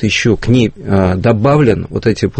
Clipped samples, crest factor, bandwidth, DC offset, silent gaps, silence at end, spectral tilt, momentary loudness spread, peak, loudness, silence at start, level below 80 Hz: under 0.1%; 12 dB; 8.8 kHz; under 0.1%; none; 0 s; -6.5 dB/octave; 4 LU; 0 dBFS; -12 LUFS; 0 s; -32 dBFS